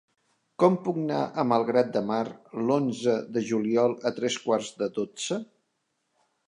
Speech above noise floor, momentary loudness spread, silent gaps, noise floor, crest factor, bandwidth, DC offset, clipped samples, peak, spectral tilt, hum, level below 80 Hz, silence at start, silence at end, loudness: 51 dB; 8 LU; none; -77 dBFS; 22 dB; 11 kHz; under 0.1%; under 0.1%; -6 dBFS; -5.5 dB/octave; none; -76 dBFS; 0.6 s; 1.05 s; -27 LUFS